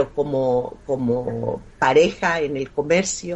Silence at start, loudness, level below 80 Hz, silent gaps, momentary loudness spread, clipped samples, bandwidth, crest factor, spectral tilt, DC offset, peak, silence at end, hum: 0 s; -21 LUFS; -48 dBFS; none; 10 LU; under 0.1%; 8.4 kHz; 16 dB; -4.5 dB/octave; under 0.1%; -4 dBFS; 0 s; none